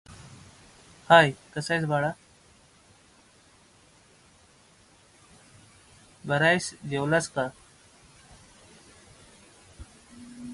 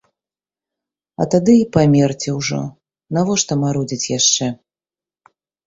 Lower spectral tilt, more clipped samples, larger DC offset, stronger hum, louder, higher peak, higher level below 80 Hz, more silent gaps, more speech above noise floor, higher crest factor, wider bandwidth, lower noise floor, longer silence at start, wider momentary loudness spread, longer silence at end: about the same, -4.5 dB/octave vs -4.5 dB/octave; neither; neither; neither; second, -24 LUFS vs -16 LUFS; about the same, -4 dBFS vs -2 dBFS; second, -60 dBFS vs -52 dBFS; neither; second, 35 dB vs over 74 dB; first, 26 dB vs 16 dB; first, 11.5 kHz vs 7.8 kHz; second, -58 dBFS vs under -90 dBFS; second, 0.1 s vs 1.2 s; first, 30 LU vs 12 LU; second, 0 s vs 1.1 s